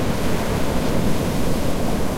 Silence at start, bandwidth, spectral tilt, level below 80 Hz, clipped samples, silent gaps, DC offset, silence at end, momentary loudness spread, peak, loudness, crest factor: 0 s; 16 kHz; -5.5 dB/octave; -28 dBFS; under 0.1%; none; under 0.1%; 0 s; 1 LU; -6 dBFS; -22 LUFS; 12 dB